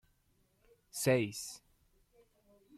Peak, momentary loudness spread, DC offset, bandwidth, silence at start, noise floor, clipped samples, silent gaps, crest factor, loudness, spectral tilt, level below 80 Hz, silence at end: -18 dBFS; 16 LU; under 0.1%; 15.5 kHz; 0.95 s; -74 dBFS; under 0.1%; none; 22 dB; -35 LUFS; -4.5 dB/octave; -72 dBFS; 1.2 s